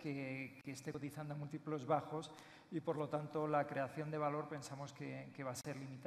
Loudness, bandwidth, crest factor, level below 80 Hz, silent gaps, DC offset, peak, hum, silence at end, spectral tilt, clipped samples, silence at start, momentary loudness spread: -44 LUFS; 14 kHz; 20 dB; -82 dBFS; none; under 0.1%; -24 dBFS; none; 0 s; -6 dB/octave; under 0.1%; 0 s; 10 LU